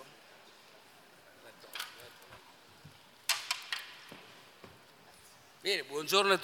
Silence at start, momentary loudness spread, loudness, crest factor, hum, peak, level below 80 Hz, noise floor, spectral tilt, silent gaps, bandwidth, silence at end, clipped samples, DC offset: 0 s; 24 LU; -34 LUFS; 28 dB; none; -10 dBFS; -84 dBFS; -59 dBFS; -1.5 dB/octave; none; 18 kHz; 0 s; under 0.1%; under 0.1%